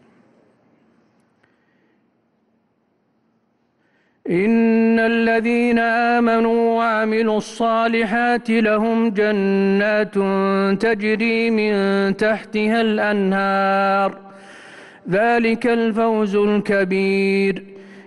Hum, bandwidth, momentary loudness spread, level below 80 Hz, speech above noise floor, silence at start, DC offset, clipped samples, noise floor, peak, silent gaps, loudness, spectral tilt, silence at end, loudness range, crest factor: none; 11.5 kHz; 4 LU; -56 dBFS; 48 dB; 4.25 s; under 0.1%; under 0.1%; -65 dBFS; -8 dBFS; none; -18 LUFS; -6.5 dB/octave; 0.05 s; 3 LU; 10 dB